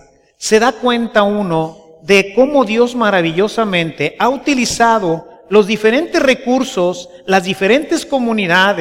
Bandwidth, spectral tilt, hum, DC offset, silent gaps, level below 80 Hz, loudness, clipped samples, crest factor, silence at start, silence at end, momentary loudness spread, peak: 16.5 kHz; -4.5 dB/octave; none; under 0.1%; none; -48 dBFS; -14 LUFS; under 0.1%; 14 dB; 0.4 s; 0 s; 7 LU; 0 dBFS